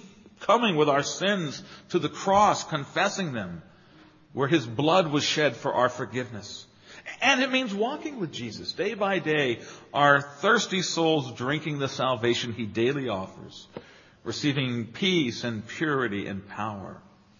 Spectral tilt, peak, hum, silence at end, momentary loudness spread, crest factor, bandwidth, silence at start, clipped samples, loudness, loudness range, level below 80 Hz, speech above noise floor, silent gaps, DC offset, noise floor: -4.5 dB/octave; -6 dBFS; none; 0.4 s; 17 LU; 22 dB; 7.4 kHz; 0 s; under 0.1%; -26 LUFS; 4 LU; -64 dBFS; 28 dB; none; under 0.1%; -54 dBFS